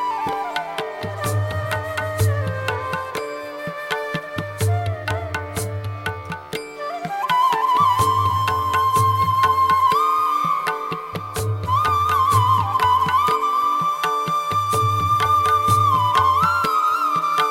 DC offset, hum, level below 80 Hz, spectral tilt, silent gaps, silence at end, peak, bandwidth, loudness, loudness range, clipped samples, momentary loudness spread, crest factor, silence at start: under 0.1%; none; -48 dBFS; -4.5 dB/octave; none; 0 s; -8 dBFS; 16.5 kHz; -20 LUFS; 8 LU; under 0.1%; 12 LU; 12 dB; 0 s